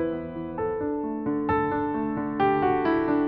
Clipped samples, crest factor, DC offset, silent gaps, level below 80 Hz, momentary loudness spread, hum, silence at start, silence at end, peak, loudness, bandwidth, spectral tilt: under 0.1%; 14 dB; under 0.1%; none; -50 dBFS; 7 LU; none; 0 s; 0 s; -12 dBFS; -26 LUFS; 5.2 kHz; -6 dB/octave